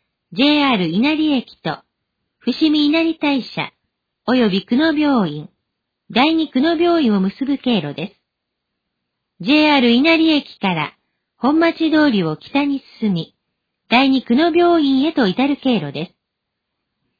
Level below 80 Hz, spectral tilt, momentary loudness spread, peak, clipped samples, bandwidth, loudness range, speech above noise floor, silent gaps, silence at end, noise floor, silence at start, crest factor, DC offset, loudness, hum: -58 dBFS; -7 dB/octave; 14 LU; -2 dBFS; under 0.1%; 5 kHz; 3 LU; 62 dB; none; 1.15 s; -77 dBFS; 0.3 s; 14 dB; under 0.1%; -16 LUFS; none